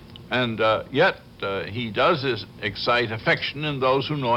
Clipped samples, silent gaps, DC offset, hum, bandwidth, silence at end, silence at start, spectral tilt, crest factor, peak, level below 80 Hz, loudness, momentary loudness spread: under 0.1%; none; under 0.1%; none; 13.5 kHz; 0 s; 0 s; -6.5 dB/octave; 16 dB; -8 dBFS; -54 dBFS; -23 LUFS; 8 LU